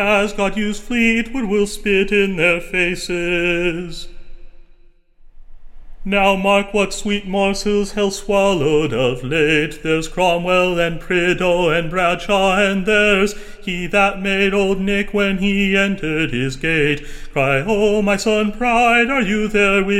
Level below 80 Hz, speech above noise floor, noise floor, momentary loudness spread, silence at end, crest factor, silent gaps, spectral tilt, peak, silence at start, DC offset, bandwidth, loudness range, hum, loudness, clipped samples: -34 dBFS; 30 dB; -47 dBFS; 6 LU; 0 s; 16 dB; none; -5 dB/octave; -2 dBFS; 0 s; under 0.1%; 16 kHz; 4 LU; none; -17 LUFS; under 0.1%